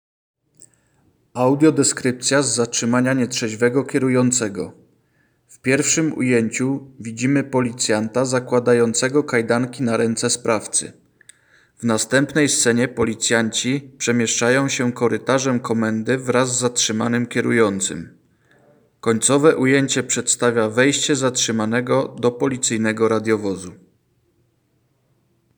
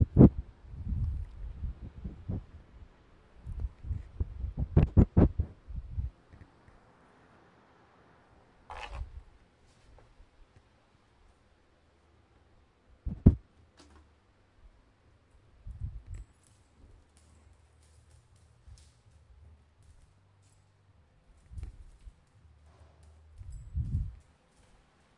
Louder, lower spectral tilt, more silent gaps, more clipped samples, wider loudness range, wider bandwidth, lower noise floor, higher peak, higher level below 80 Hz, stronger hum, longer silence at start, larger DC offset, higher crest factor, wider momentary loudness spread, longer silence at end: first, -19 LUFS vs -31 LUFS; second, -4 dB/octave vs -10.5 dB/octave; neither; neither; second, 3 LU vs 24 LU; first, over 20 kHz vs 8.2 kHz; about the same, -64 dBFS vs -66 dBFS; about the same, -2 dBFS vs -4 dBFS; second, -62 dBFS vs -42 dBFS; neither; first, 0.6 s vs 0 s; neither; second, 18 dB vs 30 dB; second, 6 LU vs 25 LU; first, 1.85 s vs 1.05 s